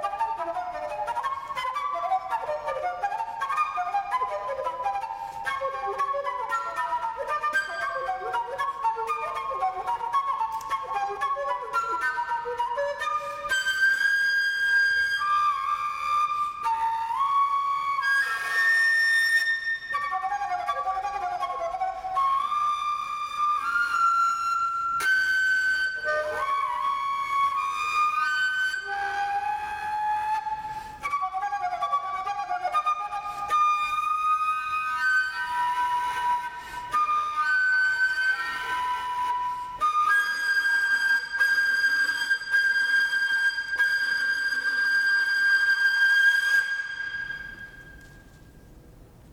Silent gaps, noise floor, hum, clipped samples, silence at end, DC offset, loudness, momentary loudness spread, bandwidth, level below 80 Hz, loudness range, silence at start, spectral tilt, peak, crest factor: none; -50 dBFS; none; under 0.1%; 0 s; under 0.1%; -25 LUFS; 9 LU; 17 kHz; -60 dBFS; 7 LU; 0 s; -0.5 dB/octave; -12 dBFS; 14 dB